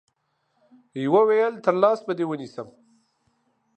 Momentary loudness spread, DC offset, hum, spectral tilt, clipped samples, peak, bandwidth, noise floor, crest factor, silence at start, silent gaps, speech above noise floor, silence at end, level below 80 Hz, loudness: 20 LU; under 0.1%; none; -7.5 dB/octave; under 0.1%; -4 dBFS; 8.6 kHz; -72 dBFS; 20 dB; 0.95 s; none; 50 dB; 1.1 s; -78 dBFS; -22 LUFS